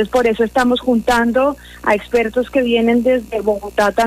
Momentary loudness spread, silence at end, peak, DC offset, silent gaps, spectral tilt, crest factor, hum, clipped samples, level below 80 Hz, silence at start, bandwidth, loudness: 5 LU; 0 s; -2 dBFS; under 0.1%; none; -5 dB/octave; 14 dB; 60 Hz at -40 dBFS; under 0.1%; -40 dBFS; 0 s; 15.5 kHz; -16 LUFS